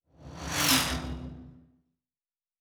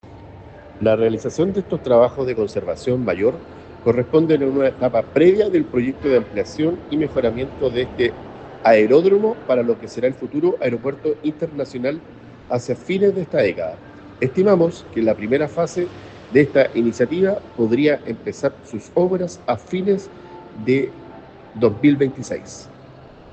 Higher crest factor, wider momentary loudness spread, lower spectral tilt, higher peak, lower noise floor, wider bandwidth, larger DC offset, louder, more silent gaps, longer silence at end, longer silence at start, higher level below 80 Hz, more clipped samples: first, 24 dB vs 18 dB; first, 24 LU vs 13 LU; second, -2 dB/octave vs -7 dB/octave; second, -10 dBFS vs -2 dBFS; first, under -90 dBFS vs -42 dBFS; first, over 20 kHz vs 8.6 kHz; neither; second, -26 LUFS vs -19 LUFS; neither; first, 1 s vs 0.4 s; first, 0.2 s vs 0.05 s; first, -46 dBFS vs -52 dBFS; neither